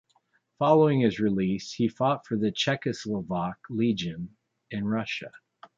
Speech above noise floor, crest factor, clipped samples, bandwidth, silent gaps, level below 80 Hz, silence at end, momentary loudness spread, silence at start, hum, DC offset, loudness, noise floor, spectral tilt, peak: 43 dB; 20 dB; under 0.1%; 7.8 kHz; none; -60 dBFS; 0.4 s; 13 LU; 0.6 s; none; under 0.1%; -27 LUFS; -69 dBFS; -6.5 dB/octave; -8 dBFS